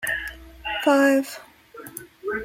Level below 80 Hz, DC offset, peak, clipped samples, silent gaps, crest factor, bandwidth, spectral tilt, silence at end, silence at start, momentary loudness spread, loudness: -50 dBFS; under 0.1%; -6 dBFS; under 0.1%; none; 18 dB; 16.5 kHz; -3.5 dB/octave; 0 s; 0 s; 21 LU; -21 LUFS